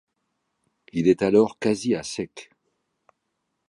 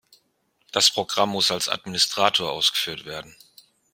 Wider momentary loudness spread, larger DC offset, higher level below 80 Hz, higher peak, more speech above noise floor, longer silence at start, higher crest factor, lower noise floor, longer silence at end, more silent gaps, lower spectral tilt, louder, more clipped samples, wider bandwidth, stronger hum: first, 15 LU vs 12 LU; neither; first, -60 dBFS vs -66 dBFS; second, -6 dBFS vs -2 dBFS; first, 56 dB vs 45 dB; first, 0.95 s vs 0.75 s; about the same, 20 dB vs 24 dB; first, -78 dBFS vs -69 dBFS; first, 1.25 s vs 0.6 s; neither; first, -6 dB/octave vs -1.5 dB/octave; about the same, -23 LUFS vs -21 LUFS; neither; second, 11.5 kHz vs 16.5 kHz; neither